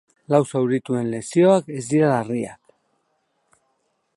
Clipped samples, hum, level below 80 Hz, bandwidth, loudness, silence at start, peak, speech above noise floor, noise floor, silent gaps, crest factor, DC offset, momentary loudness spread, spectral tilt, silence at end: under 0.1%; none; -66 dBFS; 11.5 kHz; -20 LUFS; 0.3 s; -2 dBFS; 51 dB; -70 dBFS; none; 20 dB; under 0.1%; 10 LU; -6.5 dB/octave; 1.6 s